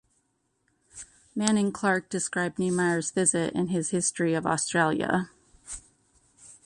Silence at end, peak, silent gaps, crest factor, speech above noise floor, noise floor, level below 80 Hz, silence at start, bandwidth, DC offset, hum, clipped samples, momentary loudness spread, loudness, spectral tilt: 0.15 s; -8 dBFS; none; 20 dB; 48 dB; -74 dBFS; -62 dBFS; 0.95 s; 11.5 kHz; under 0.1%; none; under 0.1%; 17 LU; -26 LUFS; -4 dB/octave